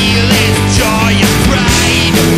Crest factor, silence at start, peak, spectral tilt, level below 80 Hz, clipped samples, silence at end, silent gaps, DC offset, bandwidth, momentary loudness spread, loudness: 10 dB; 0 s; 0 dBFS; -4 dB/octave; -22 dBFS; under 0.1%; 0 s; none; under 0.1%; 16.5 kHz; 1 LU; -9 LUFS